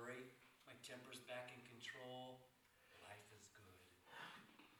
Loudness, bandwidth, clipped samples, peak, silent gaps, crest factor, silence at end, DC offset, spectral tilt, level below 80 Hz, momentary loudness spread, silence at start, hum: -58 LUFS; 19.5 kHz; under 0.1%; -42 dBFS; none; 18 dB; 0 s; under 0.1%; -3.5 dB/octave; under -90 dBFS; 13 LU; 0 s; none